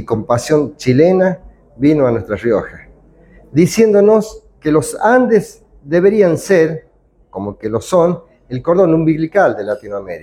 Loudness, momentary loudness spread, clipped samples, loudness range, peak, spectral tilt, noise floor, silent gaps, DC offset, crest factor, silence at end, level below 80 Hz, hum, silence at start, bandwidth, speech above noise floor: -14 LUFS; 15 LU; under 0.1%; 3 LU; 0 dBFS; -6.5 dB/octave; -47 dBFS; none; under 0.1%; 14 dB; 0 s; -46 dBFS; none; 0 s; 15 kHz; 34 dB